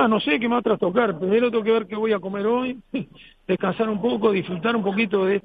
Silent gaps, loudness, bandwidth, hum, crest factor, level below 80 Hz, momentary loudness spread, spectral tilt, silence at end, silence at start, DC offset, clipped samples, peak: none; -22 LUFS; 4.9 kHz; none; 16 dB; -58 dBFS; 8 LU; -9 dB/octave; 0.05 s; 0 s; under 0.1%; under 0.1%; -6 dBFS